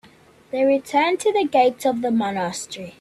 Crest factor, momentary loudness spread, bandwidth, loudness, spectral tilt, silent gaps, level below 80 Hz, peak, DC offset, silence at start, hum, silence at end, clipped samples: 16 dB; 11 LU; 14 kHz; -21 LUFS; -4 dB/octave; none; -64 dBFS; -6 dBFS; under 0.1%; 0.55 s; none; 0.1 s; under 0.1%